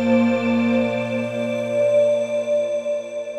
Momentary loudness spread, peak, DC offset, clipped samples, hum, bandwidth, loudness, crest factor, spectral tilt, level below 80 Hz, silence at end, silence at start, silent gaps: 7 LU; -6 dBFS; under 0.1%; under 0.1%; none; 8.6 kHz; -20 LUFS; 14 dB; -6.5 dB/octave; -68 dBFS; 0 s; 0 s; none